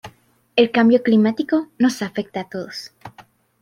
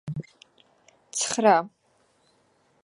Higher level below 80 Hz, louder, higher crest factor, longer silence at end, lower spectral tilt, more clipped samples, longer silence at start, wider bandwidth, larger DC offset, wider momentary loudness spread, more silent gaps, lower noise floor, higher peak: about the same, -64 dBFS vs -66 dBFS; first, -19 LUFS vs -24 LUFS; second, 18 dB vs 24 dB; second, 0.4 s vs 1.15 s; first, -5.5 dB/octave vs -3.5 dB/octave; neither; about the same, 0.05 s vs 0.05 s; first, 14.5 kHz vs 11.5 kHz; neither; about the same, 16 LU vs 17 LU; neither; second, -51 dBFS vs -66 dBFS; first, -2 dBFS vs -6 dBFS